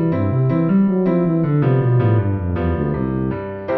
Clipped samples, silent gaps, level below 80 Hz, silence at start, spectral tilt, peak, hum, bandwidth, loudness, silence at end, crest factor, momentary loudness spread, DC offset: under 0.1%; none; -36 dBFS; 0 s; -12.5 dB/octave; -4 dBFS; none; 4.3 kHz; -18 LUFS; 0 s; 12 dB; 5 LU; 0.3%